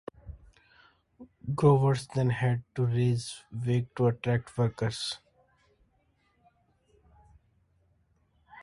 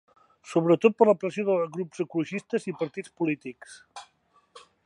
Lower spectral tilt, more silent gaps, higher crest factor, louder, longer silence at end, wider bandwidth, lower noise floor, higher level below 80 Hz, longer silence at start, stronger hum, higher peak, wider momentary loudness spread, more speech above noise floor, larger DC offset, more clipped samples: about the same, -7 dB/octave vs -7 dB/octave; neither; about the same, 22 dB vs 22 dB; second, -29 LUFS vs -26 LUFS; second, 0 s vs 0.25 s; about the same, 11.5 kHz vs 11 kHz; first, -70 dBFS vs -55 dBFS; first, -58 dBFS vs -78 dBFS; second, 0.25 s vs 0.45 s; neither; second, -10 dBFS vs -6 dBFS; second, 17 LU vs 24 LU; first, 43 dB vs 29 dB; neither; neither